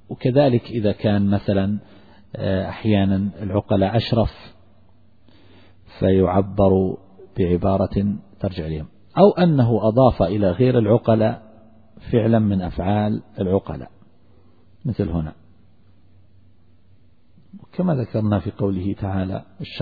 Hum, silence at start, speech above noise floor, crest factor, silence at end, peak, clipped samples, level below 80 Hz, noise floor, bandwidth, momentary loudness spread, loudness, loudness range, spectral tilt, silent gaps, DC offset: none; 0.1 s; 37 dB; 20 dB; 0 s; 0 dBFS; under 0.1%; -42 dBFS; -56 dBFS; 4.9 kHz; 13 LU; -20 LUFS; 11 LU; -11 dB/octave; none; 0.3%